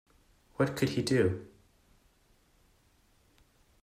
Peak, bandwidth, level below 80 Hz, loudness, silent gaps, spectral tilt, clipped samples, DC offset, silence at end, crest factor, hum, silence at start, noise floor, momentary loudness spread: -14 dBFS; 16 kHz; -64 dBFS; -31 LUFS; none; -6 dB/octave; under 0.1%; under 0.1%; 2.35 s; 20 dB; none; 0.6 s; -67 dBFS; 13 LU